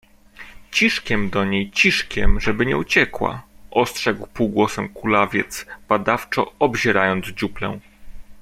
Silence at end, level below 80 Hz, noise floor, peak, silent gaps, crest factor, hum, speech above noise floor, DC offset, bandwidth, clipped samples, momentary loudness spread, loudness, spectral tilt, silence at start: 0 s; -32 dBFS; -43 dBFS; -2 dBFS; none; 20 dB; none; 23 dB; under 0.1%; 16 kHz; under 0.1%; 9 LU; -20 LUFS; -4.5 dB/octave; 0.4 s